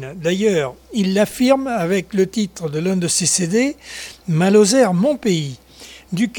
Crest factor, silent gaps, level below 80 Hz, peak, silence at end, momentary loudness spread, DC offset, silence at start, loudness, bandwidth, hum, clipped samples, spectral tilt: 16 dB; none; -52 dBFS; -2 dBFS; 0 s; 12 LU; under 0.1%; 0 s; -17 LUFS; 19 kHz; none; under 0.1%; -4.5 dB/octave